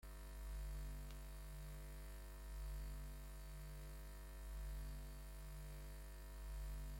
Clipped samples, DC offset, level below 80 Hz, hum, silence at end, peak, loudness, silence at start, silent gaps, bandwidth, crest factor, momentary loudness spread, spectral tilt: under 0.1%; under 0.1%; -52 dBFS; 50 Hz at -50 dBFS; 0 s; -42 dBFS; -55 LUFS; 0 s; none; 16.5 kHz; 10 dB; 5 LU; -5 dB/octave